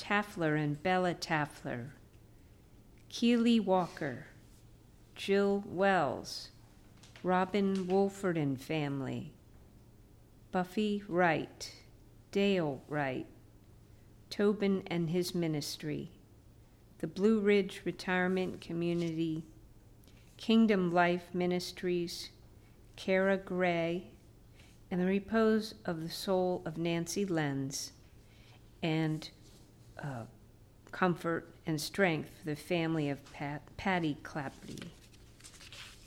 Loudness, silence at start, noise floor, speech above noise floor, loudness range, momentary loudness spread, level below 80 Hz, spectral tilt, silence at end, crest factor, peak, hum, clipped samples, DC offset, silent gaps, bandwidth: -33 LUFS; 0 s; -59 dBFS; 26 dB; 5 LU; 16 LU; -62 dBFS; -5.5 dB/octave; 0 s; 20 dB; -14 dBFS; none; under 0.1%; under 0.1%; none; 16.5 kHz